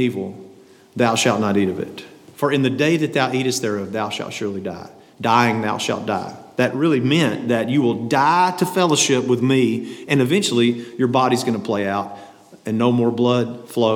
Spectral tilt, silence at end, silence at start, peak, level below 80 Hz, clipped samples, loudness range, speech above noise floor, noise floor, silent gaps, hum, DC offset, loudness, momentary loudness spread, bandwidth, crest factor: -5 dB/octave; 0 s; 0 s; -2 dBFS; -70 dBFS; under 0.1%; 4 LU; 28 dB; -46 dBFS; none; none; under 0.1%; -19 LUFS; 11 LU; 17.5 kHz; 18 dB